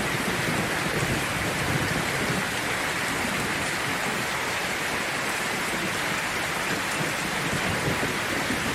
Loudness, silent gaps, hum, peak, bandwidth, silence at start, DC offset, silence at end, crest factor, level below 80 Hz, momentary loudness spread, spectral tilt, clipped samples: -26 LUFS; none; none; -12 dBFS; 16 kHz; 0 s; under 0.1%; 0 s; 14 dB; -48 dBFS; 1 LU; -3 dB/octave; under 0.1%